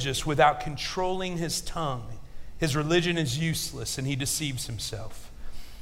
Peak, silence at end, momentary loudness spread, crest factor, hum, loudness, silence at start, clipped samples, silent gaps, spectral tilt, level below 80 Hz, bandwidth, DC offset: -8 dBFS; 0 s; 22 LU; 20 dB; none; -28 LUFS; 0 s; under 0.1%; none; -4 dB/octave; -42 dBFS; 16 kHz; under 0.1%